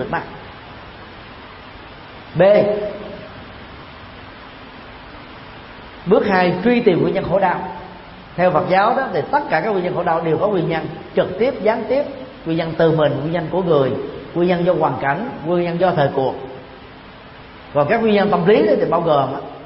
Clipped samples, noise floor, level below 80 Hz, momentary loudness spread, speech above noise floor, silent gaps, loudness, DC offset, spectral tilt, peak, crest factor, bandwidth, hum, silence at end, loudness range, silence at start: under 0.1%; -39 dBFS; -48 dBFS; 22 LU; 22 dB; none; -17 LUFS; under 0.1%; -11.5 dB/octave; 0 dBFS; 18 dB; 5.8 kHz; none; 0 s; 3 LU; 0 s